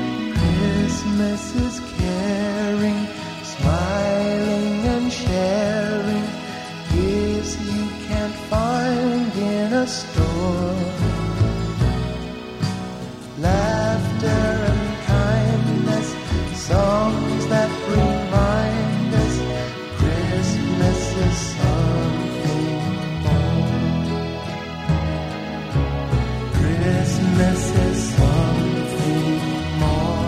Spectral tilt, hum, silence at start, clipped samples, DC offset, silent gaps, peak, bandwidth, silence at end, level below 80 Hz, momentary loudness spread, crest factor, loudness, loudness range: -6.5 dB/octave; none; 0 s; under 0.1%; under 0.1%; none; -4 dBFS; 14.5 kHz; 0 s; -30 dBFS; 7 LU; 16 dB; -21 LUFS; 3 LU